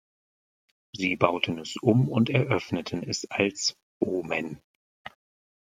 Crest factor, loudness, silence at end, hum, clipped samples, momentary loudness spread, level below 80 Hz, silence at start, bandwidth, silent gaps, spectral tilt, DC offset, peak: 26 dB; -27 LUFS; 0.7 s; none; under 0.1%; 22 LU; -66 dBFS; 0.95 s; 9.8 kHz; 3.83-4.00 s, 4.64-5.05 s; -5 dB/octave; under 0.1%; -2 dBFS